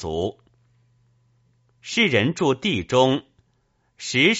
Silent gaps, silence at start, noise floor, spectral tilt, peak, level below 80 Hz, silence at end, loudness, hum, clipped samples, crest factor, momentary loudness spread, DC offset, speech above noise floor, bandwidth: none; 0 s; -67 dBFS; -3 dB/octave; -4 dBFS; -54 dBFS; 0 s; -21 LUFS; none; under 0.1%; 20 dB; 11 LU; under 0.1%; 46 dB; 8 kHz